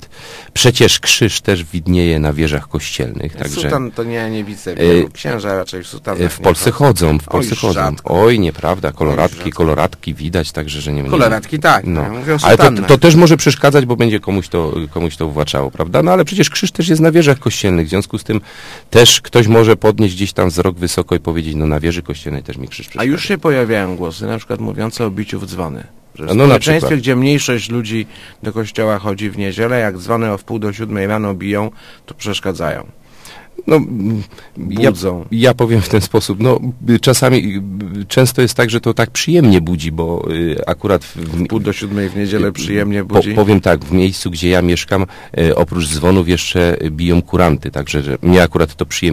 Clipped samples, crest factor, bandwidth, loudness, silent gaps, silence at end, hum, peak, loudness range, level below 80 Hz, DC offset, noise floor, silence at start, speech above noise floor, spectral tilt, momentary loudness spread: 0.4%; 14 dB; 15.5 kHz; -14 LUFS; none; 0 s; none; 0 dBFS; 7 LU; -30 dBFS; under 0.1%; -37 dBFS; 0 s; 24 dB; -5 dB/octave; 12 LU